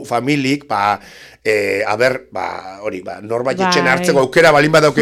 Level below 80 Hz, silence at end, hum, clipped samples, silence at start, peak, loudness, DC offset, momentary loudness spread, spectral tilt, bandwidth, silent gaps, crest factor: -52 dBFS; 0 s; none; under 0.1%; 0 s; -2 dBFS; -15 LUFS; under 0.1%; 15 LU; -4.5 dB/octave; 17 kHz; none; 14 dB